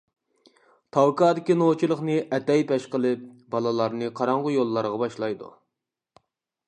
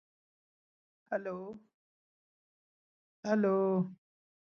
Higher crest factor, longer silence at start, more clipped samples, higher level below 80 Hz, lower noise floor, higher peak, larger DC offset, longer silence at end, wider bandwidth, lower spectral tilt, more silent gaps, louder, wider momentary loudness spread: about the same, 18 dB vs 22 dB; second, 0.95 s vs 1.1 s; neither; first, -74 dBFS vs -84 dBFS; second, -85 dBFS vs under -90 dBFS; first, -6 dBFS vs -16 dBFS; neither; first, 1.2 s vs 0.65 s; first, 10 kHz vs 6.8 kHz; about the same, -7 dB/octave vs -8 dB/octave; second, none vs 1.74-3.23 s; first, -24 LUFS vs -33 LUFS; second, 8 LU vs 16 LU